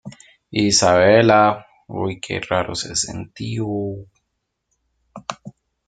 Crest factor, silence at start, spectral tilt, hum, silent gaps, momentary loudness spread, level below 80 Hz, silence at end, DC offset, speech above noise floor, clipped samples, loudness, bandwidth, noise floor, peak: 18 dB; 0.05 s; -4 dB/octave; none; none; 20 LU; -52 dBFS; 0.4 s; under 0.1%; 57 dB; under 0.1%; -18 LUFS; 9.6 kHz; -75 dBFS; -2 dBFS